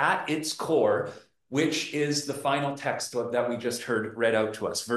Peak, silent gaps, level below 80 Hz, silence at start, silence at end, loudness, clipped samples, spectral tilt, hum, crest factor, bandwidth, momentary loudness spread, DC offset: -10 dBFS; none; -72 dBFS; 0 s; 0 s; -28 LUFS; under 0.1%; -4 dB/octave; none; 18 dB; 12.5 kHz; 6 LU; under 0.1%